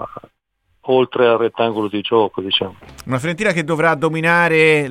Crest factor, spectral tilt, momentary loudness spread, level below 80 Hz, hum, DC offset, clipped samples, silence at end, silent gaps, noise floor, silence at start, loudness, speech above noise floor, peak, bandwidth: 16 dB; -5.5 dB/octave; 11 LU; -54 dBFS; none; under 0.1%; under 0.1%; 0 s; none; -65 dBFS; 0 s; -16 LUFS; 49 dB; -2 dBFS; 14 kHz